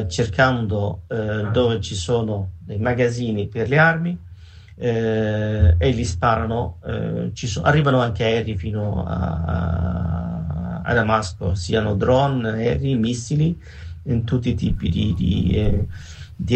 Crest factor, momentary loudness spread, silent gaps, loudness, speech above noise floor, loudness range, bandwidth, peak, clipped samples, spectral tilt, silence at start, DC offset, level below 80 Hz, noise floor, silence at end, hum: 18 dB; 9 LU; none; -21 LUFS; 22 dB; 3 LU; 8.8 kHz; -4 dBFS; under 0.1%; -6.5 dB/octave; 0 s; under 0.1%; -32 dBFS; -41 dBFS; 0 s; none